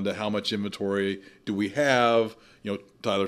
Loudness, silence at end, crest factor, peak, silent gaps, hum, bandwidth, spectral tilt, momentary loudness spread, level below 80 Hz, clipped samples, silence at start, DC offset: -27 LUFS; 0 s; 20 dB; -8 dBFS; none; none; 14.5 kHz; -5 dB/octave; 13 LU; -68 dBFS; under 0.1%; 0 s; under 0.1%